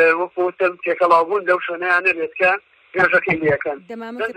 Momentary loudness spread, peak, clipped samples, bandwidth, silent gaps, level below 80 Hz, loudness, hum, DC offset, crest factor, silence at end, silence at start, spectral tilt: 11 LU; -2 dBFS; under 0.1%; 9.8 kHz; none; -58 dBFS; -18 LUFS; none; under 0.1%; 18 dB; 0.05 s; 0 s; -6 dB/octave